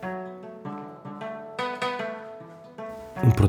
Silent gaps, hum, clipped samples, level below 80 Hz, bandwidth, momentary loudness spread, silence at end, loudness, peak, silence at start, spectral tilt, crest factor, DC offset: none; none; under 0.1%; -48 dBFS; 15 kHz; 14 LU; 0 s; -32 LUFS; -6 dBFS; 0 s; -7.5 dB/octave; 22 dB; under 0.1%